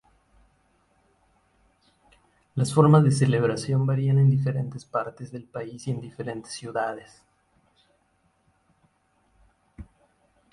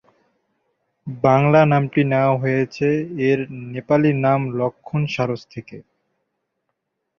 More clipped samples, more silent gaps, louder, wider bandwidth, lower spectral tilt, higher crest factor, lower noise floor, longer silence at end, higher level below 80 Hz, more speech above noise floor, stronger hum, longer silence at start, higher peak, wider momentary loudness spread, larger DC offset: neither; neither; second, -24 LUFS vs -19 LUFS; first, 11.5 kHz vs 6.8 kHz; about the same, -7.5 dB/octave vs -8.5 dB/octave; about the same, 22 dB vs 18 dB; second, -68 dBFS vs -76 dBFS; second, 0.7 s vs 1.4 s; about the same, -60 dBFS vs -56 dBFS; second, 45 dB vs 57 dB; neither; first, 2.55 s vs 1.05 s; about the same, -4 dBFS vs -2 dBFS; about the same, 18 LU vs 16 LU; neither